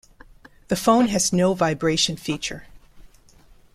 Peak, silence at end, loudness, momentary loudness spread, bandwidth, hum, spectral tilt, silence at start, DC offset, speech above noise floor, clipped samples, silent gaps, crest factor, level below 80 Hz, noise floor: -4 dBFS; 0.75 s; -21 LUFS; 10 LU; 15 kHz; none; -4 dB/octave; 0.7 s; under 0.1%; 31 dB; under 0.1%; none; 18 dB; -50 dBFS; -51 dBFS